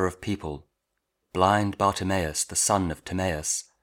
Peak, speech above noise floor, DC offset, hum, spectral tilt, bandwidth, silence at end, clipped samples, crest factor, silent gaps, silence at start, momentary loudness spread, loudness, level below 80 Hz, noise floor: -4 dBFS; 54 dB; under 0.1%; none; -4 dB/octave; 18.5 kHz; 0.2 s; under 0.1%; 22 dB; none; 0 s; 11 LU; -26 LUFS; -48 dBFS; -80 dBFS